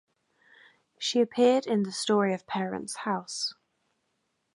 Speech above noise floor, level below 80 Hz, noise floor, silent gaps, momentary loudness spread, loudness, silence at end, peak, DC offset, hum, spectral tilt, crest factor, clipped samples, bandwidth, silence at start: 50 dB; -76 dBFS; -77 dBFS; none; 10 LU; -28 LUFS; 1.05 s; -12 dBFS; under 0.1%; none; -4.5 dB/octave; 18 dB; under 0.1%; 11.5 kHz; 1 s